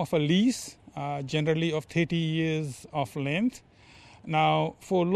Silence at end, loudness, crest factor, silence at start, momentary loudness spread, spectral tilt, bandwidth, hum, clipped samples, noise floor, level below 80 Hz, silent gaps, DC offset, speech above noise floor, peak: 0 s; -28 LUFS; 18 dB; 0 s; 10 LU; -6 dB/octave; 13 kHz; none; under 0.1%; -53 dBFS; -62 dBFS; none; under 0.1%; 26 dB; -10 dBFS